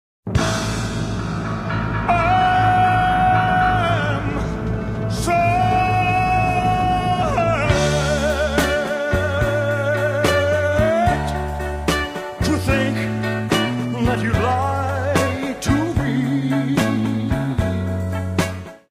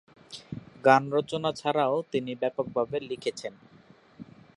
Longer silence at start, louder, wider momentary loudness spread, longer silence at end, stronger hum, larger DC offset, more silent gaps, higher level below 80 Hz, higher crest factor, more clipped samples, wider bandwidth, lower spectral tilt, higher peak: about the same, 0.25 s vs 0.3 s; first, -19 LUFS vs -27 LUFS; second, 8 LU vs 19 LU; second, 0.15 s vs 0.35 s; neither; neither; neither; first, -32 dBFS vs -68 dBFS; second, 18 dB vs 24 dB; neither; first, 15.5 kHz vs 11.5 kHz; about the same, -5.5 dB/octave vs -5.5 dB/octave; about the same, -2 dBFS vs -4 dBFS